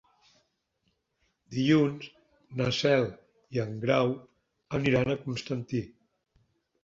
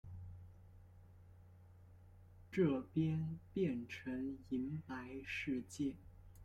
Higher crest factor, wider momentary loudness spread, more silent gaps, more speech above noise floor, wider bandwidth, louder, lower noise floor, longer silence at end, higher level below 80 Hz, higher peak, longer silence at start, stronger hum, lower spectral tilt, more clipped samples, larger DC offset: about the same, 20 dB vs 20 dB; second, 15 LU vs 26 LU; neither; first, 49 dB vs 21 dB; second, 7.8 kHz vs 13.5 kHz; first, -29 LUFS vs -42 LUFS; first, -77 dBFS vs -62 dBFS; first, 0.95 s vs 0 s; first, -60 dBFS vs -66 dBFS; first, -10 dBFS vs -24 dBFS; first, 1.5 s vs 0.05 s; neither; about the same, -6.5 dB/octave vs -7.5 dB/octave; neither; neither